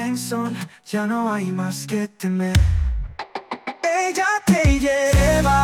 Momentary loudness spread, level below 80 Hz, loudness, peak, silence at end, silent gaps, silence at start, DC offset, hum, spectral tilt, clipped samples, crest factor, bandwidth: 14 LU; -28 dBFS; -21 LUFS; -6 dBFS; 0 s; none; 0 s; under 0.1%; none; -5.5 dB/octave; under 0.1%; 14 dB; 18 kHz